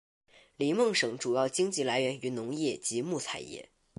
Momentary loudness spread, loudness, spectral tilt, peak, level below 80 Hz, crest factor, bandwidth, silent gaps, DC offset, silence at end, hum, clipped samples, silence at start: 10 LU; -31 LUFS; -3.5 dB/octave; -16 dBFS; -74 dBFS; 16 dB; 11.5 kHz; none; under 0.1%; 0.35 s; none; under 0.1%; 0.6 s